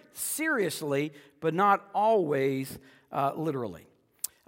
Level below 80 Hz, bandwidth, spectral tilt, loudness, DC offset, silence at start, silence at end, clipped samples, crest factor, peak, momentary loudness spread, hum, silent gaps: -72 dBFS; 16.5 kHz; -4.5 dB/octave; -29 LUFS; under 0.1%; 0.15 s; 0.65 s; under 0.1%; 18 dB; -10 dBFS; 13 LU; none; none